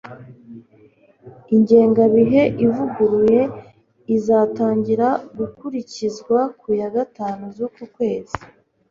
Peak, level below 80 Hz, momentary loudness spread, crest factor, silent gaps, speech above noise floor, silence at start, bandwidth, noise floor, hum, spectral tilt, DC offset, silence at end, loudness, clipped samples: -2 dBFS; -54 dBFS; 15 LU; 18 dB; none; 34 dB; 0.05 s; 7.4 kHz; -52 dBFS; none; -7.5 dB/octave; under 0.1%; 0.45 s; -18 LUFS; under 0.1%